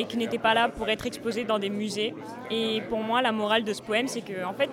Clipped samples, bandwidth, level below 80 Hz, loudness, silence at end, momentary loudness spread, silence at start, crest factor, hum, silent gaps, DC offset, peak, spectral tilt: under 0.1%; 16.5 kHz; -58 dBFS; -27 LUFS; 0 s; 8 LU; 0 s; 18 dB; none; none; under 0.1%; -8 dBFS; -4 dB/octave